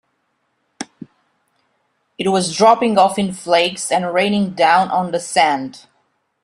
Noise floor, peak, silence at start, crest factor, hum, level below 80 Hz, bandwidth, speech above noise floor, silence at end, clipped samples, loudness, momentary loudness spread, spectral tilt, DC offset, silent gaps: -68 dBFS; 0 dBFS; 0.8 s; 18 dB; none; -62 dBFS; 12.5 kHz; 52 dB; 0.65 s; under 0.1%; -16 LUFS; 18 LU; -4 dB/octave; under 0.1%; none